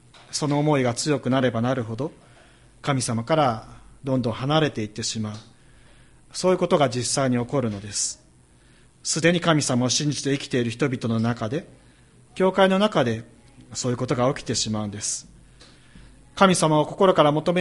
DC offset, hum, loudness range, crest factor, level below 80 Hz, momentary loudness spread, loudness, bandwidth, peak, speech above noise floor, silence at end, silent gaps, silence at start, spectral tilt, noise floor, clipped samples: under 0.1%; none; 3 LU; 22 dB; -54 dBFS; 13 LU; -23 LUFS; 11.5 kHz; -2 dBFS; 32 dB; 0 s; none; 0.3 s; -4.5 dB/octave; -54 dBFS; under 0.1%